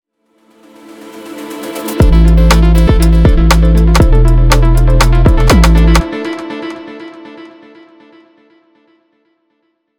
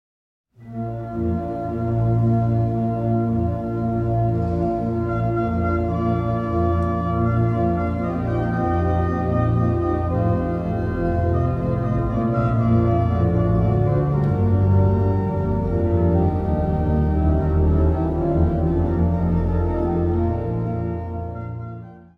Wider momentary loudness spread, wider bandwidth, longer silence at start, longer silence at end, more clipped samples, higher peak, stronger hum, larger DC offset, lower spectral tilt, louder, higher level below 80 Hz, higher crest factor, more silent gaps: first, 21 LU vs 6 LU; first, 17 kHz vs 4.4 kHz; first, 1.15 s vs 0.6 s; first, 2.5 s vs 0.15 s; neither; first, 0 dBFS vs -6 dBFS; neither; neither; second, -6 dB/octave vs -11 dB/octave; first, -10 LUFS vs -21 LUFS; first, -12 dBFS vs -30 dBFS; about the same, 10 dB vs 14 dB; neither